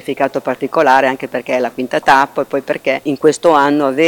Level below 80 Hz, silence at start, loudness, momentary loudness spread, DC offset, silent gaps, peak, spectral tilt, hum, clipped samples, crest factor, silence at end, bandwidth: -56 dBFS; 0.05 s; -14 LUFS; 8 LU; under 0.1%; none; 0 dBFS; -4.5 dB/octave; none; under 0.1%; 14 dB; 0 s; 19 kHz